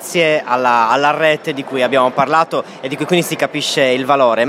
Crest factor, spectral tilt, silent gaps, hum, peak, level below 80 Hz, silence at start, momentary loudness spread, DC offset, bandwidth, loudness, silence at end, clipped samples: 14 dB; -4 dB/octave; none; none; 0 dBFS; -68 dBFS; 0 s; 7 LU; under 0.1%; 16.5 kHz; -15 LUFS; 0 s; under 0.1%